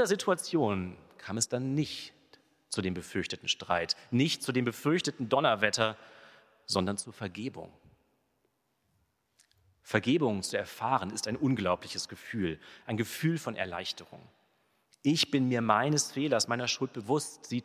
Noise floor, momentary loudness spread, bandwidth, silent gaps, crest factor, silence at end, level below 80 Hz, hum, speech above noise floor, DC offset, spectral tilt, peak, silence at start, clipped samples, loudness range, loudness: -76 dBFS; 12 LU; 16 kHz; none; 26 dB; 0 s; -62 dBFS; none; 45 dB; under 0.1%; -4 dB/octave; -6 dBFS; 0 s; under 0.1%; 7 LU; -31 LUFS